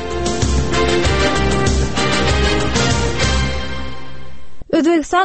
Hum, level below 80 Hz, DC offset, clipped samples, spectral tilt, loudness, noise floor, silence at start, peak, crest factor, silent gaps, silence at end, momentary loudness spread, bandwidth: none; -24 dBFS; 6%; under 0.1%; -4.5 dB/octave; -16 LUFS; -37 dBFS; 0 s; -4 dBFS; 14 dB; none; 0 s; 10 LU; 8.8 kHz